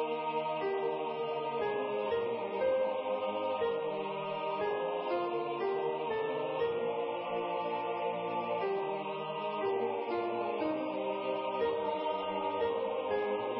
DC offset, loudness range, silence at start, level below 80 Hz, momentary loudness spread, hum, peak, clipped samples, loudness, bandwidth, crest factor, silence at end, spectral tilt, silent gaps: under 0.1%; 1 LU; 0 s; -72 dBFS; 3 LU; none; -22 dBFS; under 0.1%; -34 LUFS; 5.6 kHz; 12 dB; 0 s; -3 dB/octave; none